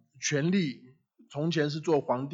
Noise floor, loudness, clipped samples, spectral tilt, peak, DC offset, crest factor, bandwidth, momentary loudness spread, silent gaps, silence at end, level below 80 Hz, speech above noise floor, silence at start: -57 dBFS; -29 LUFS; under 0.1%; -5 dB/octave; -14 dBFS; under 0.1%; 16 dB; 7.8 kHz; 10 LU; none; 0 s; -76 dBFS; 29 dB; 0.2 s